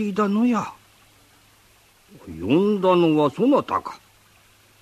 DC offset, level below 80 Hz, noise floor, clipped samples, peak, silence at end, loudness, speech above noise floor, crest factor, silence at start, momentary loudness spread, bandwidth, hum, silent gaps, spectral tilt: under 0.1%; -60 dBFS; -56 dBFS; under 0.1%; -6 dBFS; 0.85 s; -20 LUFS; 36 dB; 16 dB; 0 s; 16 LU; 14 kHz; none; none; -7.5 dB/octave